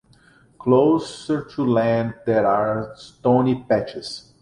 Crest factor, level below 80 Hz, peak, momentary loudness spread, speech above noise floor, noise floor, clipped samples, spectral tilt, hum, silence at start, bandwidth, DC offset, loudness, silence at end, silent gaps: 18 dB; -56 dBFS; -4 dBFS; 12 LU; 34 dB; -54 dBFS; under 0.1%; -7 dB/octave; none; 0.6 s; 11 kHz; under 0.1%; -21 LUFS; 0.25 s; none